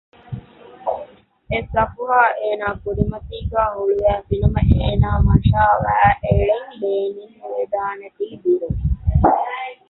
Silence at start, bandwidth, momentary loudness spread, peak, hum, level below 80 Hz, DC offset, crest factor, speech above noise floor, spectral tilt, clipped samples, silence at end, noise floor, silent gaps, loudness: 0.3 s; 4.1 kHz; 14 LU; -2 dBFS; none; -26 dBFS; under 0.1%; 16 dB; 23 dB; -11 dB/octave; under 0.1%; 0.15 s; -41 dBFS; none; -19 LUFS